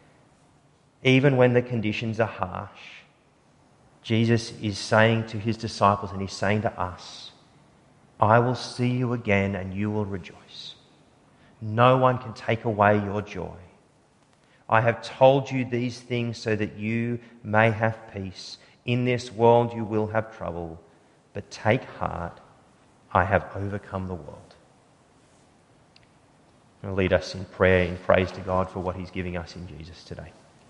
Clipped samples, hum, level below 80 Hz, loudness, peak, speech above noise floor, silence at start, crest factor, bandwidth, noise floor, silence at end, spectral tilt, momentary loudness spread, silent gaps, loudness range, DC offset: under 0.1%; none; -48 dBFS; -25 LUFS; -2 dBFS; 36 dB; 1.05 s; 24 dB; 10.5 kHz; -60 dBFS; 0.4 s; -6.5 dB/octave; 20 LU; none; 6 LU; under 0.1%